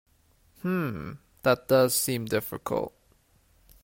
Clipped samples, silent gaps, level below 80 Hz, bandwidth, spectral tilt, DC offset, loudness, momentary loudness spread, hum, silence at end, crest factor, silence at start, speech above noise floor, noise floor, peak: under 0.1%; none; -60 dBFS; 16.5 kHz; -4.5 dB/octave; under 0.1%; -27 LUFS; 15 LU; none; 0.95 s; 20 dB; 0.65 s; 37 dB; -64 dBFS; -10 dBFS